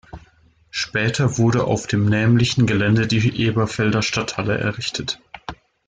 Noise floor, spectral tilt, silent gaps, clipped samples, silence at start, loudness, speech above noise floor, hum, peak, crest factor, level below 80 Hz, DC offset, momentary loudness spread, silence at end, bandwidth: -55 dBFS; -5.5 dB/octave; none; under 0.1%; 0.15 s; -19 LUFS; 36 dB; none; -6 dBFS; 14 dB; -46 dBFS; under 0.1%; 12 LU; 0.35 s; 9.4 kHz